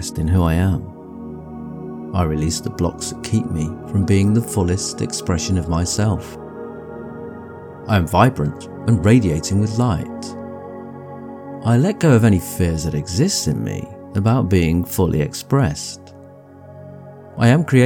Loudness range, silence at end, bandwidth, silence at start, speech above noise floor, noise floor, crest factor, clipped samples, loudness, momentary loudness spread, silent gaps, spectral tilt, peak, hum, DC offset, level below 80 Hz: 4 LU; 0 s; 18.5 kHz; 0 s; 24 dB; -41 dBFS; 18 dB; under 0.1%; -18 LUFS; 19 LU; none; -6 dB/octave; 0 dBFS; none; under 0.1%; -36 dBFS